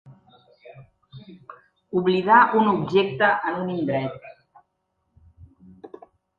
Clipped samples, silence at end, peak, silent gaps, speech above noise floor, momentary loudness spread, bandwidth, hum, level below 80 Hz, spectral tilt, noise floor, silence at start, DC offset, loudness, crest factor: under 0.1%; 0.5 s; -2 dBFS; none; 54 dB; 14 LU; 7 kHz; none; -62 dBFS; -8 dB/octave; -74 dBFS; 0.05 s; under 0.1%; -21 LUFS; 24 dB